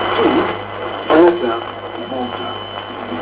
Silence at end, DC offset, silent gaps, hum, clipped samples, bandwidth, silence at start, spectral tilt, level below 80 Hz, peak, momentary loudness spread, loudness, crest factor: 0 s; under 0.1%; none; none; under 0.1%; 4 kHz; 0 s; -9.5 dB/octave; -50 dBFS; 0 dBFS; 15 LU; -18 LUFS; 18 dB